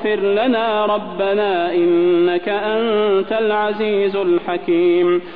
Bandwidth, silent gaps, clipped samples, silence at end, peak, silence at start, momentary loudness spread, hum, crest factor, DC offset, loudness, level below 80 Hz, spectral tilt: 4.7 kHz; none; under 0.1%; 0 s; -6 dBFS; 0 s; 5 LU; none; 10 dB; 0.9%; -17 LUFS; -56 dBFS; -9 dB/octave